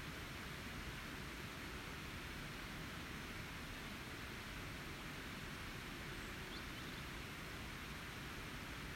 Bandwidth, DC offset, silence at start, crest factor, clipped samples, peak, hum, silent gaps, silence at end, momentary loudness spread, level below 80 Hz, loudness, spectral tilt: 16 kHz; under 0.1%; 0 s; 14 dB; under 0.1%; -36 dBFS; none; none; 0 s; 1 LU; -58 dBFS; -49 LUFS; -4 dB/octave